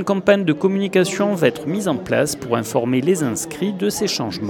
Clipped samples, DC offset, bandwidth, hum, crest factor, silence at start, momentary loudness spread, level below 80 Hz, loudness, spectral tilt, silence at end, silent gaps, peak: under 0.1%; under 0.1%; 19 kHz; none; 18 dB; 0 s; 6 LU; -56 dBFS; -19 LUFS; -5 dB/octave; 0 s; none; -2 dBFS